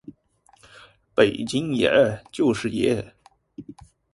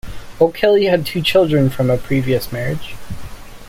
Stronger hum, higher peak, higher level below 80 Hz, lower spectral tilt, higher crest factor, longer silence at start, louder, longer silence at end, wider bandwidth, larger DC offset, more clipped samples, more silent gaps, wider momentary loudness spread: neither; about the same, -2 dBFS vs -2 dBFS; second, -54 dBFS vs -38 dBFS; about the same, -5.5 dB/octave vs -6.5 dB/octave; first, 22 dB vs 16 dB; first, 1.15 s vs 0.05 s; second, -22 LUFS vs -16 LUFS; first, 0.4 s vs 0 s; second, 11.5 kHz vs 16.5 kHz; neither; neither; neither; first, 23 LU vs 20 LU